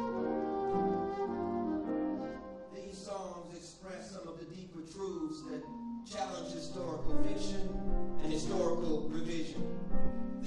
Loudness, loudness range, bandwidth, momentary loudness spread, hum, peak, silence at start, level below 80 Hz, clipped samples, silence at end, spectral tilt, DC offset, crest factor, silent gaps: -39 LUFS; 7 LU; 9.8 kHz; 13 LU; none; -16 dBFS; 0 s; -44 dBFS; under 0.1%; 0 s; -6 dB/octave; under 0.1%; 16 dB; none